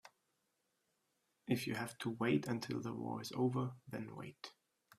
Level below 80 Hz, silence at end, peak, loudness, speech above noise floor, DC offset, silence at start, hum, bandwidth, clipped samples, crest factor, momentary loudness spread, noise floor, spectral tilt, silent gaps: -78 dBFS; 0.5 s; -22 dBFS; -41 LUFS; 44 dB; under 0.1%; 0.05 s; none; 15 kHz; under 0.1%; 20 dB; 15 LU; -84 dBFS; -6 dB/octave; none